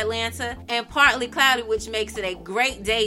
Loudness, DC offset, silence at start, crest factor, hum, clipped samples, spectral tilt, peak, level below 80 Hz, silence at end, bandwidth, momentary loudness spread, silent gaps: -22 LUFS; under 0.1%; 0 s; 20 dB; none; under 0.1%; -2 dB/octave; -2 dBFS; -44 dBFS; 0 s; 16.5 kHz; 10 LU; none